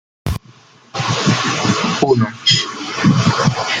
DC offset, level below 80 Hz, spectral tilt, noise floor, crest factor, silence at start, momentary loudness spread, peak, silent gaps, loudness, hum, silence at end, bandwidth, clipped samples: under 0.1%; -40 dBFS; -4.5 dB/octave; -46 dBFS; 16 dB; 0.25 s; 12 LU; 0 dBFS; none; -16 LUFS; none; 0 s; 13.5 kHz; under 0.1%